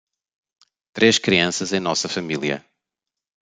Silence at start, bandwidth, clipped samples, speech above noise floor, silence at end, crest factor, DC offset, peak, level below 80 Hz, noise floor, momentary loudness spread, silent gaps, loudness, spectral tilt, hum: 0.95 s; 9.6 kHz; under 0.1%; 66 dB; 0.95 s; 20 dB; under 0.1%; -2 dBFS; -62 dBFS; -86 dBFS; 11 LU; none; -20 LUFS; -3 dB/octave; none